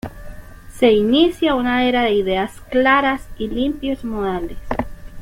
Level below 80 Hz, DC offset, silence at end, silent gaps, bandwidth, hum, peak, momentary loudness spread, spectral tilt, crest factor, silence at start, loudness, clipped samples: -36 dBFS; under 0.1%; 0 s; none; 16.5 kHz; none; -4 dBFS; 12 LU; -5.5 dB/octave; 16 dB; 0.05 s; -18 LUFS; under 0.1%